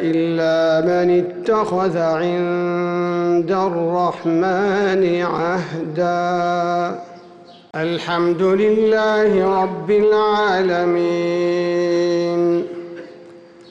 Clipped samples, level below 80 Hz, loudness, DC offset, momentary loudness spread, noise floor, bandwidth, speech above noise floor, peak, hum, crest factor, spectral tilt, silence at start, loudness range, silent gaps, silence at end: under 0.1%; -58 dBFS; -18 LUFS; under 0.1%; 7 LU; -42 dBFS; 7.8 kHz; 25 dB; -8 dBFS; none; 10 dB; -7 dB/octave; 0 s; 4 LU; none; 0 s